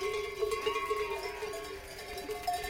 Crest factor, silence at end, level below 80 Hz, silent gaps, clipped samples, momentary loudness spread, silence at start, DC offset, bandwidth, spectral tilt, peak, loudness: 16 dB; 0 s; -54 dBFS; none; under 0.1%; 9 LU; 0 s; under 0.1%; 17 kHz; -2.5 dB/octave; -20 dBFS; -36 LUFS